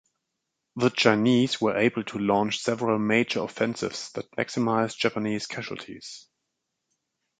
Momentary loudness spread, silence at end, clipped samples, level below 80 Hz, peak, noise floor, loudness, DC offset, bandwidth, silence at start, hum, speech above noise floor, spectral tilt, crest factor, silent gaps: 15 LU; 1.2 s; under 0.1%; -66 dBFS; -2 dBFS; -82 dBFS; -25 LUFS; under 0.1%; 9.4 kHz; 0.75 s; none; 56 dB; -5 dB/octave; 24 dB; none